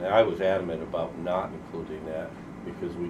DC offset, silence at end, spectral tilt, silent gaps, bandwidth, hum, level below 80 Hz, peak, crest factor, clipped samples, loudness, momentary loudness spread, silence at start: under 0.1%; 0 s; -7 dB/octave; none; 10 kHz; none; -54 dBFS; -8 dBFS; 22 dB; under 0.1%; -30 LUFS; 15 LU; 0 s